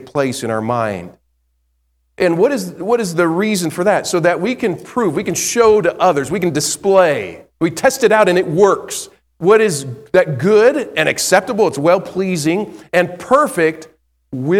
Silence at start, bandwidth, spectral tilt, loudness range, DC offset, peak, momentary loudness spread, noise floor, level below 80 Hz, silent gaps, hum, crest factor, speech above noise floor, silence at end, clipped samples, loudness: 0 s; 16 kHz; -4.5 dB/octave; 4 LU; under 0.1%; 0 dBFS; 9 LU; -63 dBFS; -54 dBFS; none; none; 16 dB; 49 dB; 0 s; under 0.1%; -15 LUFS